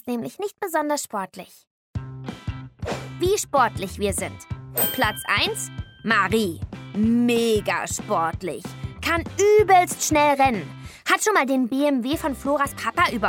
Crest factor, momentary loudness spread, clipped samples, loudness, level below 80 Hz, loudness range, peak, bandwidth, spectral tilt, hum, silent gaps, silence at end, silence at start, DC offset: 16 dB; 16 LU; under 0.1%; -22 LUFS; -44 dBFS; 7 LU; -6 dBFS; 18.5 kHz; -4 dB/octave; none; 1.67-1.94 s; 0 s; 0.05 s; under 0.1%